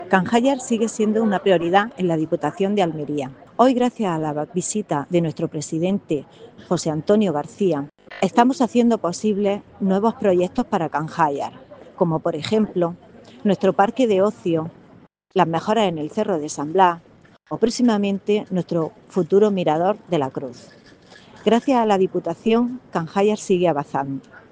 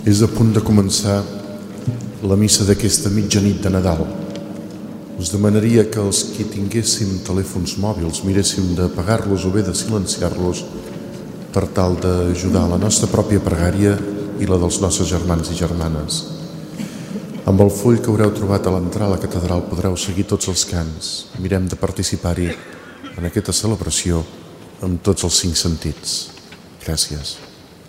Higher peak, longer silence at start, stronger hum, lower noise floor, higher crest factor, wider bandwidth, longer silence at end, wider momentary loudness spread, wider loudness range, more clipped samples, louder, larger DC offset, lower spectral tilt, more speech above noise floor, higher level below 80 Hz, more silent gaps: about the same, 0 dBFS vs 0 dBFS; about the same, 0 s vs 0 s; neither; first, -50 dBFS vs -39 dBFS; about the same, 20 dB vs 18 dB; second, 9.8 kHz vs 16 kHz; first, 0.15 s vs 0 s; second, 8 LU vs 15 LU; about the same, 2 LU vs 4 LU; neither; second, -21 LUFS vs -18 LUFS; neither; about the same, -6 dB/octave vs -5 dB/octave; first, 30 dB vs 22 dB; second, -60 dBFS vs -36 dBFS; neither